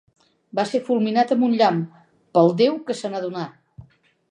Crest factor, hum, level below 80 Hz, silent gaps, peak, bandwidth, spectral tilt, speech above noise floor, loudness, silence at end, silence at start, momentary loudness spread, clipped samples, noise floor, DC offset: 18 dB; none; -66 dBFS; none; -4 dBFS; 10.5 kHz; -6.5 dB/octave; 33 dB; -21 LUFS; 0.5 s; 0.55 s; 12 LU; under 0.1%; -53 dBFS; under 0.1%